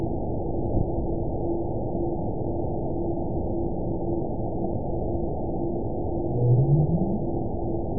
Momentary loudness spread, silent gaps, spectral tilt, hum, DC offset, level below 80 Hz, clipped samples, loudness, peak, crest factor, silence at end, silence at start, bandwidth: 7 LU; none; -19.5 dB/octave; none; 2%; -36 dBFS; under 0.1%; -27 LUFS; -10 dBFS; 16 dB; 0 s; 0 s; 1 kHz